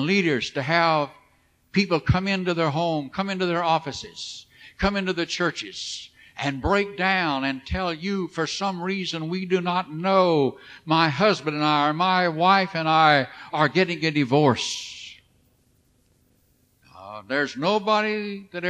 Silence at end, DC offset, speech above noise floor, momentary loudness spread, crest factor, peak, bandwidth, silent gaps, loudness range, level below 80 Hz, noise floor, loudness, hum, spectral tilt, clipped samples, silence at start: 0 s; under 0.1%; 41 dB; 13 LU; 20 dB; -4 dBFS; 10 kHz; none; 7 LU; -48 dBFS; -63 dBFS; -23 LUFS; none; -5 dB/octave; under 0.1%; 0 s